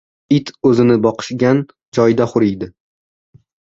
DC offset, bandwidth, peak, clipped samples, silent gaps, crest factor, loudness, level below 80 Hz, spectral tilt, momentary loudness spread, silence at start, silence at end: under 0.1%; 7.8 kHz; -2 dBFS; under 0.1%; 1.88-1.92 s; 16 dB; -15 LUFS; -52 dBFS; -7 dB/octave; 8 LU; 0.3 s; 1.05 s